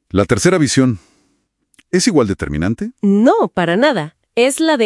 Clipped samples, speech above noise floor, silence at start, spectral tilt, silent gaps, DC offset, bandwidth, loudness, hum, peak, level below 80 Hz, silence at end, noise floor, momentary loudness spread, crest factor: under 0.1%; 50 dB; 0.15 s; -5 dB/octave; none; under 0.1%; 12 kHz; -15 LUFS; none; 0 dBFS; -42 dBFS; 0 s; -64 dBFS; 7 LU; 14 dB